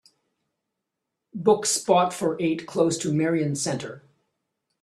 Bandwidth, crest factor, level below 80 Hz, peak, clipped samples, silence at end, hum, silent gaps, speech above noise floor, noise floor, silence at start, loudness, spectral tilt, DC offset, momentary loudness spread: 13.5 kHz; 20 dB; -68 dBFS; -6 dBFS; under 0.1%; 0.85 s; none; none; 60 dB; -83 dBFS; 1.35 s; -24 LUFS; -4.5 dB/octave; under 0.1%; 9 LU